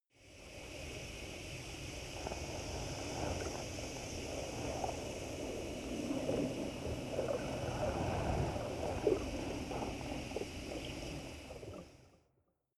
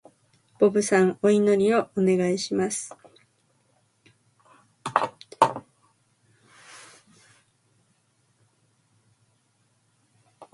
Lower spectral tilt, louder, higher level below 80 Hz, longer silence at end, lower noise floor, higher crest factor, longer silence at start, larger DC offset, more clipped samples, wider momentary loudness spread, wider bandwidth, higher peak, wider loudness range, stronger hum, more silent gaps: about the same, -5 dB/octave vs -5 dB/octave; second, -41 LUFS vs -23 LUFS; first, -52 dBFS vs -70 dBFS; first, 0.65 s vs 0.1 s; first, -79 dBFS vs -68 dBFS; about the same, 22 dB vs 26 dB; second, 0.2 s vs 0.6 s; neither; neither; second, 11 LU vs 21 LU; first, 14.5 kHz vs 11.5 kHz; second, -20 dBFS vs -2 dBFS; second, 5 LU vs 9 LU; neither; neither